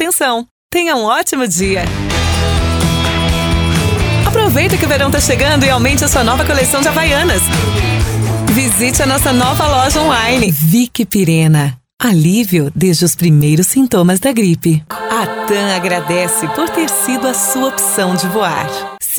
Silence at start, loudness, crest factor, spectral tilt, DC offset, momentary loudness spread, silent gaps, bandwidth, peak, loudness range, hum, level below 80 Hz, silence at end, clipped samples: 0 s; -12 LUFS; 12 dB; -4.5 dB/octave; under 0.1%; 5 LU; 0.51-0.70 s; over 20 kHz; 0 dBFS; 3 LU; none; -26 dBFS; 0 s; under 0.1%